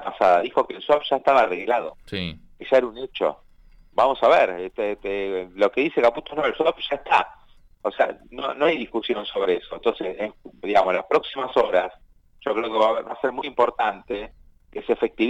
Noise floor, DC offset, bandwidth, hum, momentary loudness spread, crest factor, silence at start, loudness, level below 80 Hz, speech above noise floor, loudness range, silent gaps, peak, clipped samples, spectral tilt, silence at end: -51 dBFS; under 0.1%; 9.2 kHz; none; 13 LU; 16 dB; 0 s; -23 LUFS; -54 dBFS; 28 dB; 3 LU; none; -6 dBFS; under 0.1%; -5.5 dB/octave; 0 s